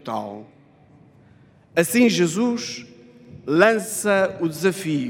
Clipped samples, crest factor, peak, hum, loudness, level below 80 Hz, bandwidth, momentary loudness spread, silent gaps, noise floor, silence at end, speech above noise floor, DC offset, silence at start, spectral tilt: under 0.1%; 22 dB; 0 dBFS; none; -20 LUFS; -68 dBFS; 16.5 kHz; 17 LU; none; -52 dBFS; 0 s; 32 dB; under 0.1%; 0.05 s; -4.5 dB/octave